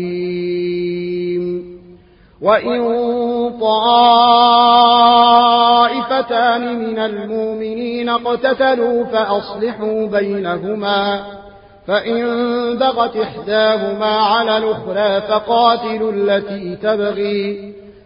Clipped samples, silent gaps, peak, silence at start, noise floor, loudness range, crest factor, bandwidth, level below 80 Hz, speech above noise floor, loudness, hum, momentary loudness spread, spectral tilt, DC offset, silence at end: under 0.1%; none; 0 dBFS; 0 s; -45 dBFS; 8 LU; 14 dB; 5.4 kHz; -52 dBFS; 30 dB; -15 LUFS; none; 12 LU; -9.5 dB/octave; under 0.1%; 0.15 s